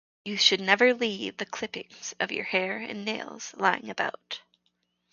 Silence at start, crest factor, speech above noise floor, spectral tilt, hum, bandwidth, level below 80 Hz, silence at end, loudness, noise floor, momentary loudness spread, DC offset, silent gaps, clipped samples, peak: 0.25 s; 26 dB; 47 dB; -2.5 dB/octave; 60 Hz at -60 dBFS; 7.4 kHz; -76 dBFS; 0.75 s; -27 LUFS; -75 dBFS; 17 LU; under 0.1%; none; under 0.1%; -4 dBFS